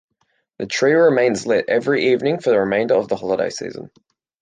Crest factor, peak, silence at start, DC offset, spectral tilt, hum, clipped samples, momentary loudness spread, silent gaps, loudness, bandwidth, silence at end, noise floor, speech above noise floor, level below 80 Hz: 14 dB; -4 dBFS; 0.6 s; under 0.1%; -5 dB/octave; none; under 0.1%; 13 LU; none; -18 LUFS; 9.6 kHz; 0.55 s; -68 dBFS; 50 dB; -62 dBFS